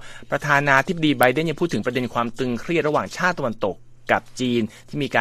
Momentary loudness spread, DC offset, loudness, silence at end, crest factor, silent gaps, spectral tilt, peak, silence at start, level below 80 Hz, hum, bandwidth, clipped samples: 10 LU; under 0.1%; -22 LUFS; 0 s; 22 dB; none; -5.5 dB/octave; 0 dBFS; 0 s; -50 dBFS; none; 14.5 kHz; under 0.1%